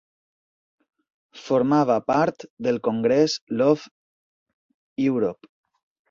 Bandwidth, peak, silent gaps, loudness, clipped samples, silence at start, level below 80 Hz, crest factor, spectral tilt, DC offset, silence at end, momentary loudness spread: 7.6 kHz; -6 dBFS; 2.50-2.57 s, 3.42-3.47 s, 3.91-4.46 s, 4.54-4.96 s; -22 LUFS; under 0.1%; 1.35 s; -66 dBFS; 18 dB; -6 dB/octave; under 0.1%; 0.8 s; 8 LU